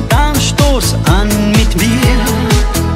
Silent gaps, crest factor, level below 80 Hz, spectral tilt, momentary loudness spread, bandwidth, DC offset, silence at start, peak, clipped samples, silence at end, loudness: none; 10 dB; -14 dBFS; -5 dB/octave; 2 LU; 16.5 kHz; under 0.1%; 0 s; 0 dBFS; under 0.1%; 0 s; -11 LUFS